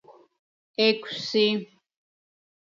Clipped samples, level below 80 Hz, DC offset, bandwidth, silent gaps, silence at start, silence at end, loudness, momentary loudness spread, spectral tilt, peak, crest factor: under 0.1%; -82 dBFS; under 0.1%; 7.4 kHz; 0.39-0.74 s; 0.1 s; 1.15 s; -24 LUFS; 9 LU; -4.5 dB/octave; -8 dBFS; 22 dB